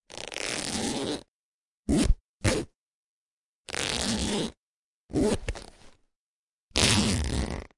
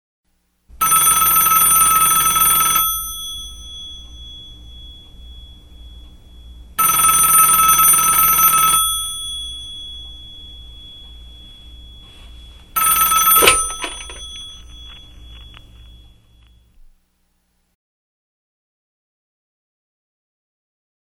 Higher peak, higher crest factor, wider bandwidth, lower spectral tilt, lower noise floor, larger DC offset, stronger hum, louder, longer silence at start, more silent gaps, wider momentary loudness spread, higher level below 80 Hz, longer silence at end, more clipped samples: second, -4 dBFS vs 0 dBFS; first, 28 dB vs 20 dB; second, 11.5 kHz vs 19.5 kHz; first, -3.5 dB/octave vs 0.5 dB/octave; first, under -90 dBFS vs -65 dBFS; second, under 0.1% vs 0.3%; neither; second, -28 LUFS vs -12 LUFS; second, 0.1 s vs 0.8 s; first, 1.28-1.84 s, 2.20-2.40 s, 2.75-3.65 s, 4.57-5.09 s, 6.16-6.69 s vs none; second, 14 LU vs 23 LU; about the same, -38 dBFS vs -40 dBFS; second, 0.1 s vs 5.7 s; neither